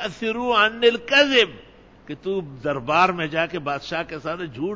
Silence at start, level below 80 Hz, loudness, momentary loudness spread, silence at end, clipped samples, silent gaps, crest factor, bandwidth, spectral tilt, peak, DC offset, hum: 0 s; -54 dBFS; -21 LUFS; 13 LU; 0 s; under 0.1%; none; 18 dB; 7.8 kHz; -4 dB/octave; -4 dBFS; under 0.1%; none